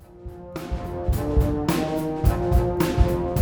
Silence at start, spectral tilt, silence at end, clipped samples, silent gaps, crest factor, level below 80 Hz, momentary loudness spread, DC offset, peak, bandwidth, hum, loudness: 0.1 s; -7 dB/octave; 0 s; under 0.1%; none; 18 dB; -26 dBFS; 14 LU; under 0.1%; -4 dBFS; over 20 kHz; none; -24 LUFS